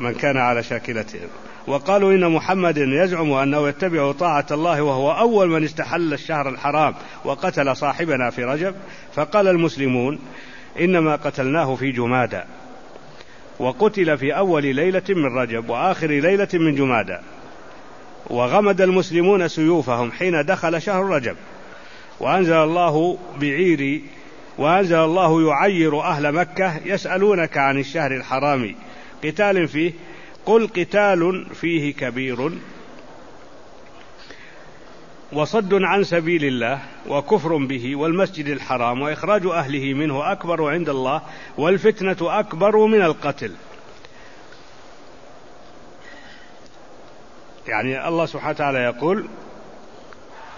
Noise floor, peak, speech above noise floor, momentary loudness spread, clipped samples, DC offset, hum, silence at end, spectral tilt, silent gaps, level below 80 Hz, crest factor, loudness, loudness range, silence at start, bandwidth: -45 dBFS; -2 dBFS; 26 dB; 12 LU; under 0.1%; 0.8%; none; 0 s; -6.5 dB/octave; none; -56 dBFS; 18 dB; -20 LUFS; 6 LU; 0 s; 7.4 kHz